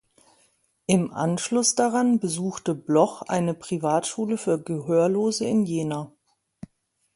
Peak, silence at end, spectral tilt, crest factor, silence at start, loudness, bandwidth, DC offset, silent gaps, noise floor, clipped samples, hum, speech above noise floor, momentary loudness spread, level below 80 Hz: -6 dBFS; 1.05 s; -5 dB/octave; 18 dB; 0.9 s; -24 LUFS; 11.5 kHz; under 0.1%; none; -68 dBFS; under 0.1%; none; 45 dB; 7 LU; -66 dBFS